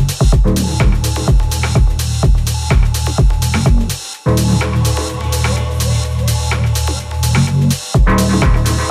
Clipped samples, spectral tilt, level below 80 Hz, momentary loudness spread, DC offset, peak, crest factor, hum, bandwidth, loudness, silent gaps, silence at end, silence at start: under 0.1%; -5 dB/octave; -16 dBFS; 4 LU; under 0.1%; -2 dBFS; 10 dB; none; 15 kHz; -15 LUFS; none; 0 s; 0 s